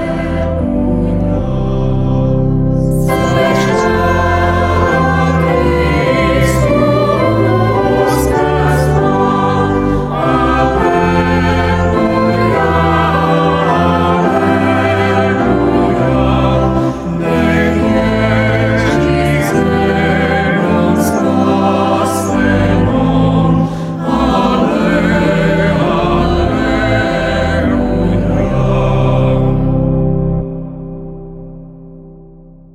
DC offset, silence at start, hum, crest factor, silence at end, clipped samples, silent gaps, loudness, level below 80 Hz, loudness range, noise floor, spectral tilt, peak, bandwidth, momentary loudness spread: under 0.1%; 0 s; none; 12 dB; 0.45 s; under 0.1%; none; -12 LUFS; -24 dBFS; 2 LU; -37 dBFS; -7 dB/octave; 0 dBFS; 15 kHz; 4 LU